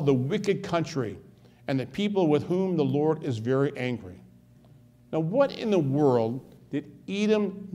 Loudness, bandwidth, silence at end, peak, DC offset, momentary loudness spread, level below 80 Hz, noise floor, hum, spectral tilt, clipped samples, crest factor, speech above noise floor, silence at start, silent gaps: -27 LUFS; 12 kHz; 0 s; -10 dBFS; under 0.1%; 12 LU; -64 dBFS; -55 dBFS; none; -7.5 dB/octave; under 0.1%; 18 dB; 29 dB; 0 s; none